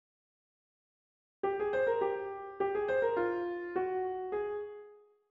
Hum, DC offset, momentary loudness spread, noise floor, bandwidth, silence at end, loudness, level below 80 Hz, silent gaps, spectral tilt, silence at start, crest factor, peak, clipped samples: none; under 0.1%; 9 LU; -57 dBFS; 5 kHz; 0.35 s; -34 LUFS; -70 dBFS; none; -7.5 dB/octave; 1.45 s; 16 dB; -20 dBFS; under 0.1%